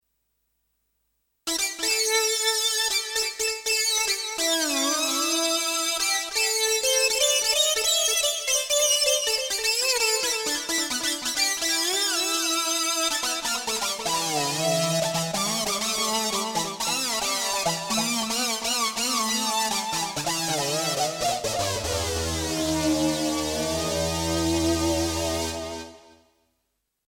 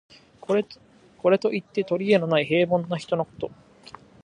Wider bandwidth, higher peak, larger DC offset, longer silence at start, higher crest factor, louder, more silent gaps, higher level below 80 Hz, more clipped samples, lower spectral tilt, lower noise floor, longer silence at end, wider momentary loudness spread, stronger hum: first, 17.5 kHz vs 10.5 kHz; about the same, -8 dBFS vs -6 dBFS; neither; first, 1.45 s vs 0.5 s; about the same, 18 dB vs 18 dB; about the same, -23 LUFS vs -24 LUFS; neither; first, -48 dBFS vs -64 dBFS; neither; second, -1.5 dB/octave vs -7 dB/octave; first, -77 dBFS vs -48 dBFS; first, 1.15 s vs 0.75 s; second, 6 LU vs 15 LU; neither